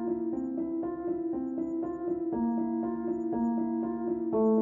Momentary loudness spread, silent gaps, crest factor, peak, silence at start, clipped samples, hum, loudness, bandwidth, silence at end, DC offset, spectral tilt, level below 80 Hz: 4 LU; none; 14 dB; -16 dBFS; 0 s; under 0.1%; none; -32 LUFS; 2.1 kHz; 0 s; under 0.1%; -11.5 dB/octave; -62 dBFS